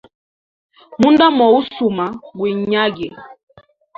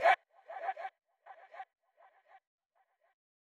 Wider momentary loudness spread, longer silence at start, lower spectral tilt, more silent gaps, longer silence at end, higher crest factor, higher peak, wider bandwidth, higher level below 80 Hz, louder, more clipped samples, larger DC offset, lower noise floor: second, 16 LU vs 24 LU; first, 0.9 s vs 0 s; first, -6.5 dB/octave vs -0.5 dB/octave; neither; second, 0.65 s vs 1.8 s; second, 16 dB vs 24 dB; first, -2 dBFS vs -16 dBFS; second, 7.6 kHz vs 11.5 kHz; first, -56 dBFS vs under -90 dBFS; first, -15 LUFS vs -37 LUFS; neither; neither; first, under -90 dBFS vs -77 dBFS